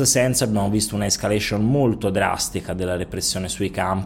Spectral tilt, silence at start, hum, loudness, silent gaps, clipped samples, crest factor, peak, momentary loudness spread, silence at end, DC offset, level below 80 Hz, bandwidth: -4 dB/octave; 0 s; none; -21 LUFS; none; under 0.1%; 16 dB; -4 dBFS; 6 LU; 0 s; under 0.1%; -42 dBFS; 17.5 kHz